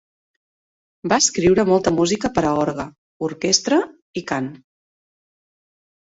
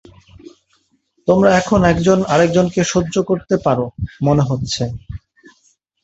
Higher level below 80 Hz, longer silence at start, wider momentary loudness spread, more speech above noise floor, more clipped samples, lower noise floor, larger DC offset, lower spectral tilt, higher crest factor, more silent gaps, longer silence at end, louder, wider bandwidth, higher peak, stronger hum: second, -50 dBFS vs -40 dBFS; second, 1.05 s vs 1.25 s; first, 15 LU vs 12 LU; first, over 71 dB vs 47 dB; neither; first, under -90 dBFS vs -62 dBFS; neither; second, -3.5 dB/octave vs -6 dB/octave; about the same, 20 dB vs 16 dB; first, 2.98-3.20 s, 4.02-4.14 s vs none; first, 1.6 s vs 0.85 s; second, -19 LUFS vs -16 LUFS; about the same, 8 kHz vs 8.2 kHz; about the same, -2 dBFS vs 0 dBFS; neither